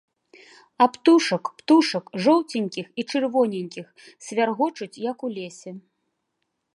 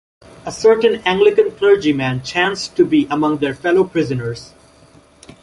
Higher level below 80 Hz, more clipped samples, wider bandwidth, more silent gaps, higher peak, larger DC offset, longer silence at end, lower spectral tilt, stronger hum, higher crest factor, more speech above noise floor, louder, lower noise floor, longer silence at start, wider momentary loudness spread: second, -78 dBFS vs -52 dBFS; neither; about the same, 11.5 kHz vs 11.5 kHz; neither; about the same, -4 dBFS vs -2 dBFS; neither; about the same, 0.95 s vs 0.95 s; about the same, -5 dB/octave vs -5.5 dB/octave; neither; first, 20 dB vs 14 dB; first, 55 dB vs 32 dB; second, -22 LUFS vs -16 LUFS; first, -77 dBFS vs -48 dBFS; first, 0.8 s vs 0.45 s; first, 17 LU vs 10 LU